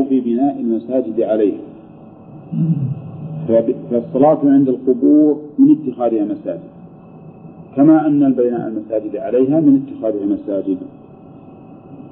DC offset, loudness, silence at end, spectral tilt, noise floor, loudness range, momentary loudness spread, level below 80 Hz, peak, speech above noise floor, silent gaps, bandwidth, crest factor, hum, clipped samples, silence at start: under 0.1%; -16 LUFS; 0 s; -13.5 dB/octave; -39 dBFS; 5 LU; 14 LU; -60 dBFS; -2 dBFS; 24 dB; none; 3.6 kHz; 14 dB; none; under 0.1%; 0 s